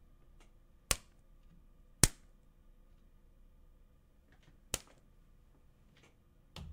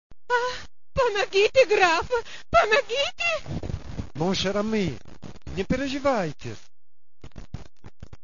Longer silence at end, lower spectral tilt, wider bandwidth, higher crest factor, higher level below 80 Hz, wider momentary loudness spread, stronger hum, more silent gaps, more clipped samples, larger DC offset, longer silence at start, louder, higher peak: second, 0 s vs 0.35 s; second, -2 dB/octave vs -4.5 dB/octave; first, 15.5 kHz vs 7.4 kHz; first, 42 dB vs 20 dB; second, -52 dBFS vs -46 dBFS; about the same, 19 LU vs 21 LU; neither; neither; neither; second, under 0.1% vs 1%; first, 0.9 s vs 0.1 s; second, -34 LUFS vs -24 LUFS; first, -2 dBFS vs -6 dBFS